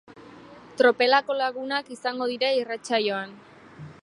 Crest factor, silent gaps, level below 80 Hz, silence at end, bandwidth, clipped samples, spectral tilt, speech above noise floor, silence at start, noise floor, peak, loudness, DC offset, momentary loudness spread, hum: 20 dB; none; -72 dBFS; 0.1 s; 11 kHz; under 0.1%; -3.5 dB/octave; 23 dB; 0.1 s; -47 dBFS; -6 dBFS; -24 LUFS; under 0.1%; 20 LU; none